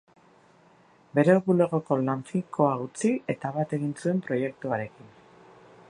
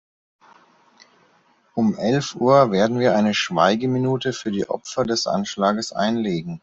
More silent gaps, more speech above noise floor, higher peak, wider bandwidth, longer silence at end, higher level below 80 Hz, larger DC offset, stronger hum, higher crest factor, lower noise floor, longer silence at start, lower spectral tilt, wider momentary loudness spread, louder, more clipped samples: neither; second, 32 dB vs 39 dB; second, -8 dBFS vs -4 dBFS; first, 11 kHz vs 8 kHz; first, 0.8 s vs 0.05 s; second, -70 dBFS vs -60 dBFS; neither; neither; about the same, 20 dB vs 18 dB; about the same, -58 dBFS vs -59 dBFS; second, 1.15 s vs 1.75 s; first, -7.5 dB/octave vs -5.5 dB/octave; about the same, 10 LU vs 9 LU; second, -26 LUFS vs -20 LUFS; neither